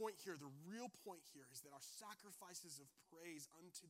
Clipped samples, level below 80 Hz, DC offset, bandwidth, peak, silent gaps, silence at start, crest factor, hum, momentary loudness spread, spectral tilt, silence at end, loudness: under 0.1%; under -90 dBFS; under 0.1%; 16 kHz; -36 dBFS; none; 0 s; 22 dB; none; 5 LU; -3 dB/octave; 0 s; -57 LUFS